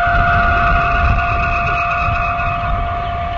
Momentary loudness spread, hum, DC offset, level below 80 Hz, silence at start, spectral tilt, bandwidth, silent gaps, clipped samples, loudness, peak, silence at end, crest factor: 6 LU; none; under 0.1%; -22 dBFS; 0 s; -7 dB/octave; 7 kHz; none; under 0.1%; -15 LUFS; -2 dBFS; 0 s; 14 dB